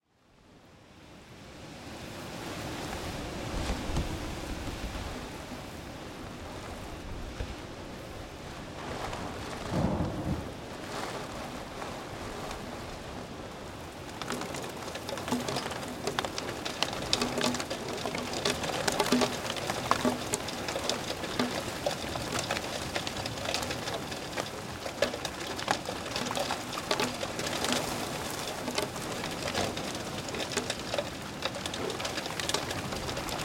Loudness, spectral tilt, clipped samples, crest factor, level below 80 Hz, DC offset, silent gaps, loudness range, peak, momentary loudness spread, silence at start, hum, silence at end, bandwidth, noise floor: -34 LUFS; -3.5 dB/octave; under 0.1%; 30 dB; -48 dBFS; under 0.1%; none; 10 LU; -4 dBFS; 12 LU; 0.45 s; none; 0 s; 17 kHz; -62 dBFS